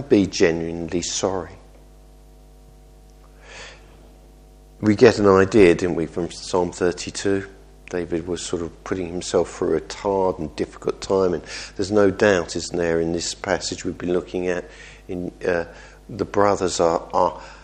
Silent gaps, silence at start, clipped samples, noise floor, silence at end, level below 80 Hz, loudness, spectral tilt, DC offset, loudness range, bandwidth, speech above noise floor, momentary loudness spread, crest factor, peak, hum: none; 0 s; under 0.1%; -47 dBFS; 0.05 s; -46 dBFS; -21 LUFS; -5 dB/octave; under 0.1%; 8 LU; 10.5 kHz; 26 dB; 15 LU; 22 dB; 0 dBFS; none